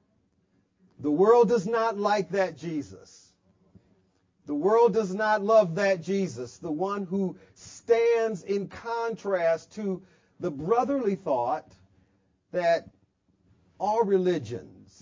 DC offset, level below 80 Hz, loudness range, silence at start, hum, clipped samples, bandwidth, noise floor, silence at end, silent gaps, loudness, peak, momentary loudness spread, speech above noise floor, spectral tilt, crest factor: under 0.1%; -66 dBFS; 4 LU; 1 s; none; under 0.1%; 7.6 kHz; -70 dBFS; 0.35 s; none; -26 LUFS; -8 dBFS; 13 LU; 44 dB; -6.5 dB/octave; 18 dB